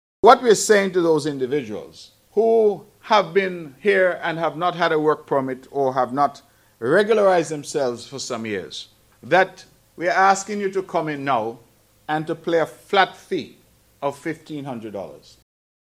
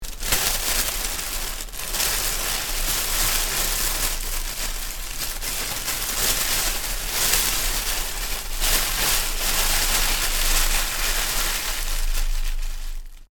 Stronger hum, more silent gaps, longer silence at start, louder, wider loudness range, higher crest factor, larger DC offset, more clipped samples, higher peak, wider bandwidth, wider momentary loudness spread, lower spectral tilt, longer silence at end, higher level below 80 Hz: neither; neither; first, 0.25 s vs 0 s; about the same, -20 LUFS vs -22 LUFS; about the same, 5 LU vs 3 LU; about the same, 20 dB vs 20 dB; neither; neither; about the same, 0 dBFS vs -2 dBFS; second, 15.5 kHz vs 19 kHz; first, 15 LU vs 9 LU; first, -4 dB/octave vs -0.5 dB/octave; first, 0.65 s vs 0.05 s; second, -64 dBFS vs -28 dBFS